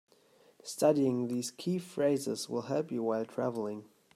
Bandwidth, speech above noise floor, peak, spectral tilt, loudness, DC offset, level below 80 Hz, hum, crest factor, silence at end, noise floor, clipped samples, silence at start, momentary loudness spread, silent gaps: 16 kHz; 32 dB; -14 dBFS; -5.5 dB/octave; -33 LUFS; under 0.1%; -80 dBFS; none; 20 dB; 0.3 s; -64 dBFS; under 0.1%; 0.65 s; 11 LU; none